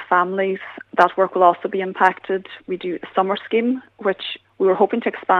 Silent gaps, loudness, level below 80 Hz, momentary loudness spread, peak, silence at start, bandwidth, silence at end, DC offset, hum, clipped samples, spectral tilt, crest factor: none; -20 LUFS; -70 dBFS; 10 LU; 0 dBFS; 0 s; 7 kHz; 0 s; under 0.1%; none; under 0.1%; -6.5 dB/octave; 20 dB